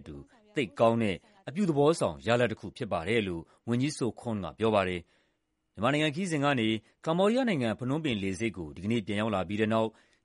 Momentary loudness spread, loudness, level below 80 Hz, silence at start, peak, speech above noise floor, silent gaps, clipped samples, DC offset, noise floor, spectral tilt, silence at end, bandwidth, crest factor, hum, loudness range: 10 LU; -30 LUFS; -60 dBFS; 0 s; -8 dBFS; 48 dB; none; under 0.1%; under 0.1%; -77 dBFS; -6 dB/octave; 0.35 s; 11.5 kHz; 20 dB; none; 2 LU